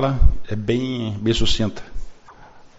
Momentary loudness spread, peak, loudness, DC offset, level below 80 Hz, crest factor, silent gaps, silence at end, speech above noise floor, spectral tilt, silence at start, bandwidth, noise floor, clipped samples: 19 LU; -2 dBFS; -22 LUFS; under 0.1%; -24 dBFS; 18 dB; none; 0.1 s; 27 dB; -5.5 dB/octave; 0 s; 8 kHz; -44 dBFS; under 0.1%